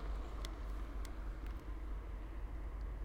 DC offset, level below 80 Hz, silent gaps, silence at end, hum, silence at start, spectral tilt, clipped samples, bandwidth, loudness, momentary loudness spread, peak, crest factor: under 0.1%; -44 dBFS; none; 0 s; none; 0 s; -6 dB/octave; under 0.1%; 14 kHz; -48 LUFS; 2 LU; -26 dBFS; 18 dB